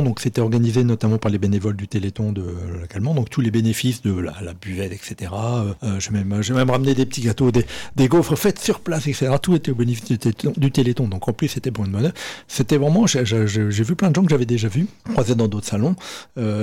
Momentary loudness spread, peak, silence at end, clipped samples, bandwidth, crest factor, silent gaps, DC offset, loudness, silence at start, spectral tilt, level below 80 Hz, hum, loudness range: 10 LU; -8 dBFS; 0 s; under 0.1%; 17 kHz; 12 dB; none; under 0.1%; -20 LUFS; 0 s; -6 dB/octave; -46 dBFS; none; 4 LU